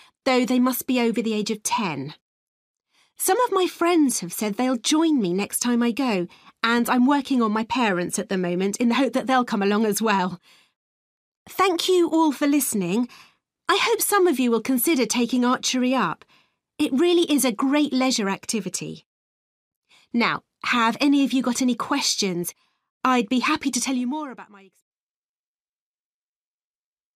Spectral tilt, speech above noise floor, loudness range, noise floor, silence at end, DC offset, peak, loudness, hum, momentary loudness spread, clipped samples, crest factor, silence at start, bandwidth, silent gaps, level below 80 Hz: -3.5 dB/octave; over 68 dB; 4 LU; under -90 dBFS; 2.7 s; under 0.1%; -6 dBFS; -22 LUFS; none; 8 LU; under 0.1%; 18 dB; 0.25 s; 15.5 kHz; 2.21-2.74 s, 10.76-11.46 s, 19.06-19.82 s, 22.90-23.01 s; -68 dBFS